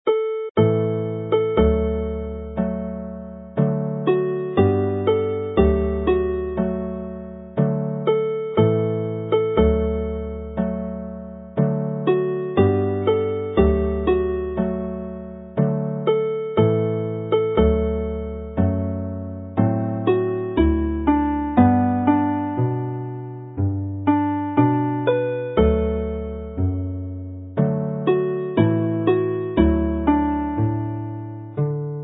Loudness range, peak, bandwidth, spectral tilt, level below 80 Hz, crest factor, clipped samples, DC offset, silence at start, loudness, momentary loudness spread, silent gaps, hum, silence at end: 3 LU; -2 dBFS; 4 kHz; -13 dB/octave; -32 dBFS; 18 dB; under 0.1%; under 0.1%; 0.05 s; -22 LUFS; 11 LU; 0.51-0.55 s; none; 0 s